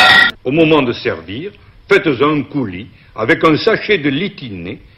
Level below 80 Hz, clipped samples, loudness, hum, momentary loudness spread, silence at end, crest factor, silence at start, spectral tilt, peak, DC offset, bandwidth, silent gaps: -46 dBFS; under 0.1%; -13 LUFS; none; 16 LU; 0.2 s; 14 dB; 0 s; -5.5 dB/octave; 0 dBFS; under 0.1%; 15.5 kHz; none